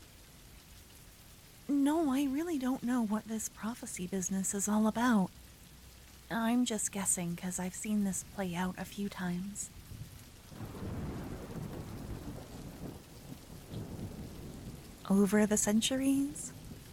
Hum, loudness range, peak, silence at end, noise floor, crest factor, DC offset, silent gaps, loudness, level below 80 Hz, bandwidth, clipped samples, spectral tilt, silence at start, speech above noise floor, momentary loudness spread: none; 12 LU; -16 dBFS; 0 s; -56 dBFS; 18 dB; under 0.1%; none; -34 LUFS; -56 dBFS; 17.5 kHz; under 0.1%; -4.5 dB/octave; 0 s; 23 dB; 25 LU